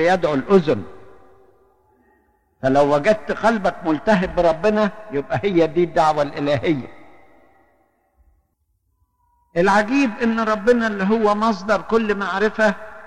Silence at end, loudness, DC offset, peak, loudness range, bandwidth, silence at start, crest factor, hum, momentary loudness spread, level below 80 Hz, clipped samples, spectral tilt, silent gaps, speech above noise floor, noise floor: 0 s; -19 LUFS; under 0.1%; -4 dBFS; 6 LU; 11 kHz; 0 s; 16 dB; none; 6 LU; -46 dBFS; under 0.1%; -6.5 dB/octave; none; 50 dB; -68 dBFS